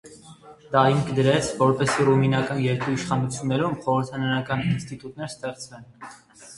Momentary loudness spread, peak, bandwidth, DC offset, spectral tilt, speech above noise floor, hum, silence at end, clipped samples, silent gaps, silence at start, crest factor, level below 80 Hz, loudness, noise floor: 18 LU; -4 dBFS; 11.5 kHz; under 0.1%; -6 dB/octave; 24 dB; none; 0 s; under 0.1%; none; 0.05 s; 20 dB; -54 dBFS; -23 LUFS; -47 dBFS